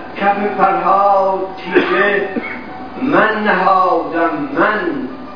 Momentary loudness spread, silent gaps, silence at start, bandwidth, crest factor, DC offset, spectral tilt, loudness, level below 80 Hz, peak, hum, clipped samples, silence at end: 10 LU; none; 0 s; 5.4 kHz; 14 dB; 2%; -7.5 dB/octave; -14 LUFS; -52 dBFS; 0 dBFS; none; under 0.1%; 0 s